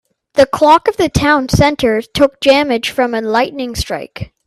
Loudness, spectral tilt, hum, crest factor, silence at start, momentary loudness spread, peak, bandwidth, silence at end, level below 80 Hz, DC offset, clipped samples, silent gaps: -13 LUFS; -5 dB/octave; none; 14 dB; 0.35 s; 11 LU; 0 dBFS; 14 kHz; 0.2 s; -34 dBFS; under 0.1%; under 0.1%; none